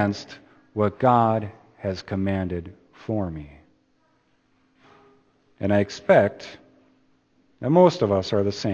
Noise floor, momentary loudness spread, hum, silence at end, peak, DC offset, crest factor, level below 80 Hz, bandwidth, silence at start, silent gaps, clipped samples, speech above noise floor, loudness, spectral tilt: -65 dBFS; 21 LU; none; 0 s; -2 dBFS; under 0.1%; 22 dB; -56 dBFS; 8 kHz; 0 s; none; under 0.1%; 43 dB; -23 LUFS; -7 dB/octave